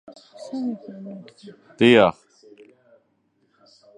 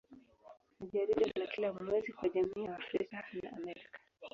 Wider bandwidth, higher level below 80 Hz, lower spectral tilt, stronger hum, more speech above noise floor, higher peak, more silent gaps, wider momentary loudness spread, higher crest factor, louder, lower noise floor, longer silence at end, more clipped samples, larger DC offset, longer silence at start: first, 9.8 kHz vs 7.4 kHz; first, -62 dBFS vs -70 dBFS; first, -6 dB/octave vs -4 dB/octave; neither; first, 46 dB vs 22 dB; first, -2 dBFS vs -20 dBFS; neither; first, 25 LU vs 16 LU; about the same, 22 dB vs 18 dB; first, -19 LUFS vs -37 LUFS; first, -67 dBFS vs -59 dBFS; first, 1.85 s vs 0.05 s; neither; neither; first, 0.4 s vs 0.1 s